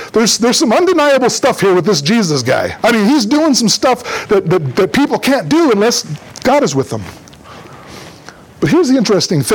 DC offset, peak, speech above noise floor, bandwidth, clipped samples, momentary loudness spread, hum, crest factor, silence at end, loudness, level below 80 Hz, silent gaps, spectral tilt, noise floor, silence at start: under 0.1%; -2 dBFS; 25 dB; 19 kHz; under 0.1%; 8 LU; none; 10 dB; 0 s; -12 LUFS; -48 dBFS; none; -4 dB/octave; -36 dBFS; 0 s